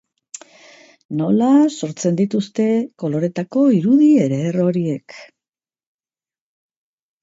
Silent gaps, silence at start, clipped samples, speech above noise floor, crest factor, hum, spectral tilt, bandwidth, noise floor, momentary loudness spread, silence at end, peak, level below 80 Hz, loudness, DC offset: none; 1.1 s; under 0.1%; over 74 dB; 16 dB; none; -7 dB/octave; 8 kHz; under -90 dBFS; 15 LU; 2 s; -4 dBFS; -66 dBFS; -17 LUFS; under 0.1%